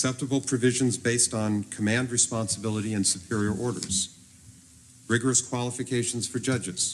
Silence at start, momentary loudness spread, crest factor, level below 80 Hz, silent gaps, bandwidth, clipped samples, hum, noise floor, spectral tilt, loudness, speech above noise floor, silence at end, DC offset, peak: 0 s; 6 LU; 18 dB; -60 dBFS; none; 13.5 kHz; under 0.1%; none; -53 dBFS; -3.5 dB/octave; -26 LUFS; 26 dB; 0 s; under 0.1%; -10 dBFS